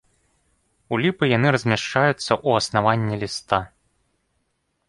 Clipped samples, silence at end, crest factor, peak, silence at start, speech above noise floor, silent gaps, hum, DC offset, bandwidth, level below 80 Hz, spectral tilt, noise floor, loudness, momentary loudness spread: under 0.1%; 1.2 s; 20 dB; -2 dBFS; 0.9 s; 51 dB; none; none; under 0.1%; 11.5 kHz; -54 dBFS; -5.5 dB/octave; -72 dBFS; -21 LUFS; 7 LU